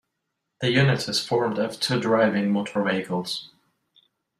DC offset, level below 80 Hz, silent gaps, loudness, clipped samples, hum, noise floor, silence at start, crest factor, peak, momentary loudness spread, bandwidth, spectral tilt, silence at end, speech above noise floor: under 0.1%; -62 dBFS; none; -24 LUFS; under 0.1%; none; -80 dBFS; 0.6 s; 18 dB; -8 dBFS; 8 LU; 14.5 kHz; -5.5 dB/octave; 0.95 s; 57 dB